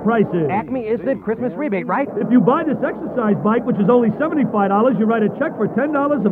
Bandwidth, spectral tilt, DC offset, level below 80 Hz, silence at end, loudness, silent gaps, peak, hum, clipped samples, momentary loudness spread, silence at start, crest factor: 4 kHz; -10.5 dB/octave; under 0.1%; -54 dBFS; 0 s; -18 LUFS; none; 0 dBFS; none; under 0.1%; 7 LU; 0 s; 16 dB